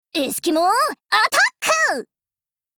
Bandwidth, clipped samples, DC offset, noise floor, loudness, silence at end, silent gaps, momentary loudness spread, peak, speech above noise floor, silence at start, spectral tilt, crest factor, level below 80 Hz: over 20 kHz; under 0.1%; under 0.1%; under -90 dBFS; -18 LUFS; 0.75 s; none; 6 LU; -4 dBFS; over 71 dB; 0.15 s; -0.5 dB/octave; 16 dB; -66 dBFS